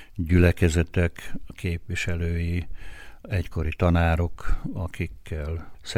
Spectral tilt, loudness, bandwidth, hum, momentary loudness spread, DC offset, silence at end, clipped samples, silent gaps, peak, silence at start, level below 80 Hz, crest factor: -6.5 dB/octave; -26 LUFS; 13 kHz; none; 17 LU; under 0.1%; 0 s; under 0.1%; none; -8 dBFS; 0 s; -34 dBFS; 18 dB